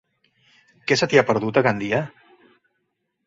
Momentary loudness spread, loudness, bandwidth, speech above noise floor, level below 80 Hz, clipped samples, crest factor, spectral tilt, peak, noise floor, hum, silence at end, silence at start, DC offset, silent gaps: 12 LU; -20 LUFS; 7.8 kHz; 55 dB; -60 dBFS; under 0.1%; 22 dB; -5 dB/octave; -2 dBFS; -75 dBFS; none; 1.2 s; 0.85 s; under 0.1%; none